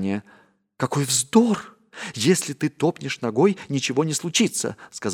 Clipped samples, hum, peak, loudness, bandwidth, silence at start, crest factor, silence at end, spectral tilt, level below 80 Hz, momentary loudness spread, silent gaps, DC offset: under 0.1%; none; -4 dBFS; -22 LUFS; 18 kHz; 0 s; 20 dB; 0 s; -4 dB/octave; -68 dBFS; 12 LU; none; under 0.1%